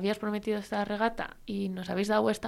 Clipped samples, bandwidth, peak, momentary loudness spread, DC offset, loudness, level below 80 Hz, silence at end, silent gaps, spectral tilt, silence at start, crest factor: under 0.1%; 14 kHz; -14 dBFS; 8 LU; under 0.1%; -31 LUFS; -56 dBFS; 0 s; none; -5.5 dB/octave; 0 s; 18 dB